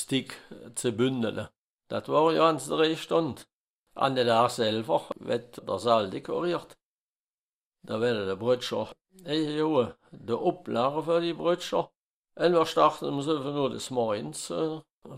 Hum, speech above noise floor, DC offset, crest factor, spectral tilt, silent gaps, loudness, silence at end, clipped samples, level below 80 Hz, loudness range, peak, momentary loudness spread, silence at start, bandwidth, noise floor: none; over 62 dB; under 0.1%; 20 dB; -5 dB/octave; 1.58-1.79 s, 3.53-3.84 s, 6.85-7.72 s, 11.97-12.24 s, 14.91-15.02 s; -28 LUFS; 0 s; under 0.1%; -68 dBFS; 5 LU; -8 dBFS; 13 LU; 0 s; 15.5 kHz; under -90 dBFS